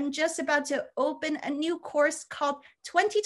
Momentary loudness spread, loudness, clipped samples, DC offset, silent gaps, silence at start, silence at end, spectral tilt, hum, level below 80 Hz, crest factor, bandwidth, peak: 5 LU; -29 LUFS; under 0.1%; under 0.1%; none; 0 s; 0 s; -1.5 dB/octave; none; -76 dBFS; 20 dB; 12.5 kHz; -10 dBFS